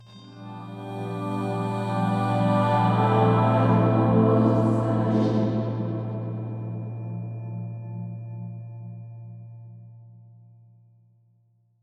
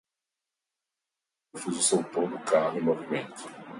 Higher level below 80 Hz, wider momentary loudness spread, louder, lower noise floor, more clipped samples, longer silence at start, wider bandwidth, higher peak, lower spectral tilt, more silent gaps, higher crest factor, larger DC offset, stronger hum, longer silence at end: first, -56 dBFS vs -78 dBFS; first, 20 LU vs 16 LU; first, -24 LUFS vs -28 LUFS; second, -64 dBFS vs -88 dBFS; neither; second, 0 s vs 1.55 s; second, 9 kHz vs 11.5 kHz; first, -8 dBFS vs -12 dBFS; first, -9 dB/octave vs -3.5 dB/octave; neither; about the same, 16 dB vs 20 dB; neither; neither; first, 1.7 s vs 0 s